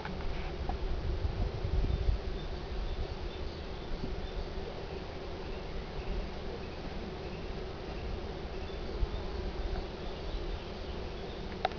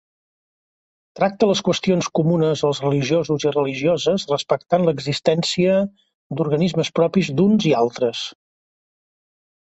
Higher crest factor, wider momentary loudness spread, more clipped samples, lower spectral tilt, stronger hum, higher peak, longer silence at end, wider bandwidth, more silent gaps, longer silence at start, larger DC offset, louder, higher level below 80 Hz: about the same, 22 dB vs 18 dB; about the same, 6 LU vs 5 LU; neither; about the same, -7 dB/octave vs -6 dB/octave; neither; second, -14 dBFS vs -2 dBFS; second, 0 s vs 1.4 s; second, 5.4 kHz vs 8.2 kHz; second, none vs 6.14-6.30 s; second, 0 s vs 1.15 s; first, 0.2% vs under 0.1%; second, -40 LUFS vs -19 LUFS; first, -38 dBFS vs -58 dBFS